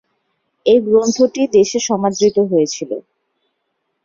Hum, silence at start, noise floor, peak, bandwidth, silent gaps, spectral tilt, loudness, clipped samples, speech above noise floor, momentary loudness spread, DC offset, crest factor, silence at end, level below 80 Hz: none; 0.65 s; -71 dBFS; -2 dBFS; 7.6 kHz; none; -4.5 dB/octave; -15 LUFS; under 0.1%; 57 dB; 10 LU; under 0.1%; 14 dB; 1.05 s; -58 dBFS